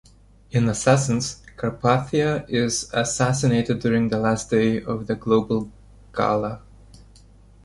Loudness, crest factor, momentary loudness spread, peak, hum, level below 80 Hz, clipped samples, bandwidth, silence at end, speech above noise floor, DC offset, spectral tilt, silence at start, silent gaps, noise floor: -22 LUFS; 18 dB; 9 LU; -4 dBFS; none; -48 dBFS; under 0.1%; 11.5 kHz; 1.05 s; 28 dB; under 0.1%; -5.5 dB/octave; 0.55 s; none; -49 dBFS